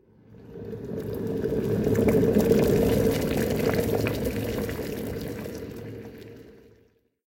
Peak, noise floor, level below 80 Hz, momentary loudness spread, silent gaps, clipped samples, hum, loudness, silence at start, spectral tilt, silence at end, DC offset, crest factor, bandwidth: -6 dBFS; -63 dBFS; -42 dBFS; 19 LU; none; under 0.1%; none; -26 LUFS; 0.3 s; -6.5 dB/octave; 0.7 s; under 0.1%; 20 dB; 17 kHz